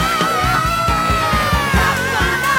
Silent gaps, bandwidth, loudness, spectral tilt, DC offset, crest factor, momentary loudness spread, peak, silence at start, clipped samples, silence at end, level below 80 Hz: none; 17.5 kHz; -15 LUFS; -4 dB/octave; under 0.1%; 12 dB; 1 LU; -4 dBFS; 0 s; under 0.1%; 0 s; -26 dBFS